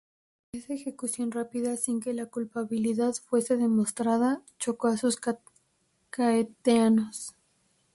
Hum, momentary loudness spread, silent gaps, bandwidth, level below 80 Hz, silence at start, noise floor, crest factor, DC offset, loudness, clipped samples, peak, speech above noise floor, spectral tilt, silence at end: none; 12 LU; none; 11.5 kHz; -70 dBFS; 0.55 s; -72 dBFS; 18 dB; under 0.1%; -28 LUFS; under 0.1%; -12 dBFS; 44 dB; -4.5 dB/octave; 0.65 s